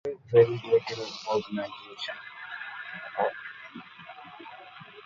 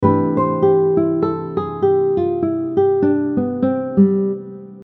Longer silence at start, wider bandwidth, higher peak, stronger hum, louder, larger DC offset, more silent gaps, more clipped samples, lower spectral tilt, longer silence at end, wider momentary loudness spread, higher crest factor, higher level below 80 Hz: about the same, 0.05 s vs 0 s; first, 7.2 kHz vs 4.2 kHz; second, -8 dBFS vs 0 dBFS; neither; second, -29 LUFS vs -17 LUFS; neither; neither; neither; second, -5.5 dB/octave vs -12 dB/octave; about the same, 0.05 s vs 0 s; first, 23 LU vs 7 LU; first, 22 dB vs 16 dB; second, -72 dBFS vs -54 dBFS